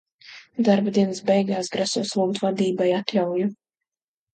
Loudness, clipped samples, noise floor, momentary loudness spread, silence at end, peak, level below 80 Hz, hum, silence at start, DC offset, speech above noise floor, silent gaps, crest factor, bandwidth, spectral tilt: -23 LUFS; under 0.1%; under -90 dBFS; 5 LU; 0.8 s; -4 dBFS; -70 dBFS; none; 0.25 s; under 0.1%; over 68 dB; none; 18 dB; 9.2 kHz; -5.5 dB/octave